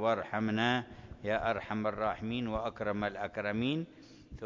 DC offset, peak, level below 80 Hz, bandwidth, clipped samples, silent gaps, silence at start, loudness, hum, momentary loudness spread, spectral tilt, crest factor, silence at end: under 0.1%; -16 dBFS; -56 dBFS; 7.4 kHz; under 0.1%; none; 0 s; -34 LUFS; none; 8 LU; -6.5 dB/octave; 18 dB; 0 s